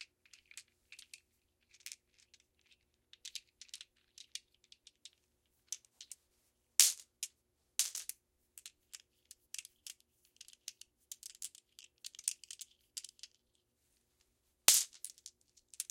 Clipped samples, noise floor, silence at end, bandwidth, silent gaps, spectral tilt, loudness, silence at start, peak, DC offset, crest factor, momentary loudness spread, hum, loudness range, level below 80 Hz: under 0.1%; -80 dBFS; 0.05 s; 16.5 kHz; none; 4 dB/octave; -35 LUFS; 0 s; -2 dBFS; under 0.1%; 40 dB; 28 LU; 60 Hz at -95 dBFS; 18 LU; -86 dBFS